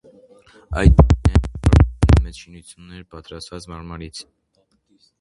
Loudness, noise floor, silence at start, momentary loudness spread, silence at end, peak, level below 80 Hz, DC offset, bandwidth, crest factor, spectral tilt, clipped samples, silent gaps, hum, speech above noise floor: -16 LUFS; -65 dBFS; 0.7 s; 25 LU; 1 s; 0 dBFS; -22 dBFS; under 0.1%; 11.5 kHz; 18 dB; -7.5 dB/octave; under 0.1%; none; none; 46 dB